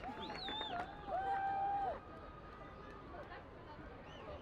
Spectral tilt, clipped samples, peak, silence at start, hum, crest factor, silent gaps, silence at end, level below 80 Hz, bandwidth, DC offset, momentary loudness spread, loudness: -5.5 dB/octave; under 0.1%; -28 dBFS; 0 s; none; 16 dB; none; 0 s; -60 dBFS; 9 kHz; under 0.1%; 15 LU; -44 LUFS